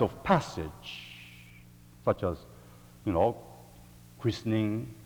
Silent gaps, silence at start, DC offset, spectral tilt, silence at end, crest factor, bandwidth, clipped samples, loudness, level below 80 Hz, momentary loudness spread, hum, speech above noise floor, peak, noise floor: none; 0 s; under 0.1%; -7 dB/octave; 0 s; 24 dB; over 20 kHz; under 0.1%; -31 LUFS; -56 dBFS; 24 LU; none; 24 dB; -8 dBFS; -53 dBFS